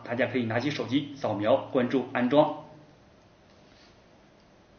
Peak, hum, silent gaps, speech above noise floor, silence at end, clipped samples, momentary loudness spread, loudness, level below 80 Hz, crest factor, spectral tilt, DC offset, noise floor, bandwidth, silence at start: -8 dBFS; none; none; 31 dB; 2.05 s; under 0.1%; 6 LU; -27 LUFS; -68 dBFS; 20 dB; -4.5 dB/octave; under 0.1%; -57 dBFS; 6.8 kHz; 0 s